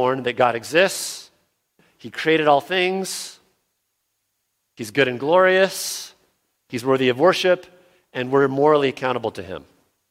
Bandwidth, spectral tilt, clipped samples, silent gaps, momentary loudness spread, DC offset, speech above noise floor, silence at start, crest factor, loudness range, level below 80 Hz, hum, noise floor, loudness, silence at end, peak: 16.5 kHz; -4 dB/octave; under 0.1%; none; 17 LU; under 0.1%; 54 dB; 0 s; 20 dB; 4 LU; -66 dBFS; none; -74 dBFS; -19 LUFS; 0.5 s; -2 dBFS